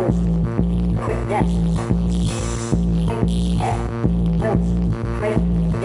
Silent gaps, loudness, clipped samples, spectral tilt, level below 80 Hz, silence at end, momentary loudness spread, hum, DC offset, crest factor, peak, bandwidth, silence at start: none; -20 LUFS; under 0.1%; -7.5 dB/octave; -24 dBFS; 0 s; 3 LU; none; under 0.1%; 14 dB; -4 dBFS; 11.5 kHz; 0 s